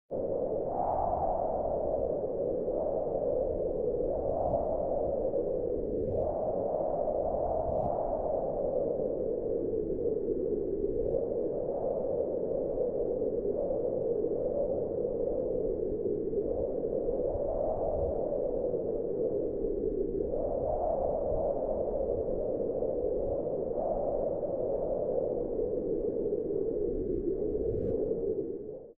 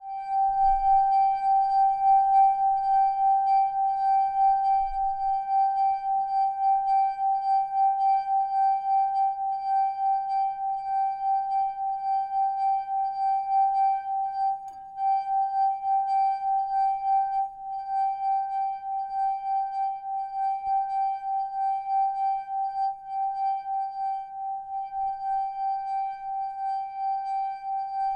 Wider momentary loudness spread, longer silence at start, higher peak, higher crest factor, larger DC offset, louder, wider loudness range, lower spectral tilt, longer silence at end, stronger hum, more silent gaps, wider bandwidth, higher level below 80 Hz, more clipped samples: second, 2 LU vs 9 LU; about the same, 0.1 s vs 0 s; second, -18 dBFS vs -14 dBFS; about the same, 14 dB vs 12 dB; first, 0.2% vs under 0.1%; second, -32 LUFS vs -26 LUFS; second, 1 LU vs 8 LU; first, -13 dB/octave vs -3.5 dB/octave; about the same, 0.05 s vs 0 s; neither; neither; second, 2.1 kHz vs 5 kHz; first, -46 dBFS vs -54 dBFS; neither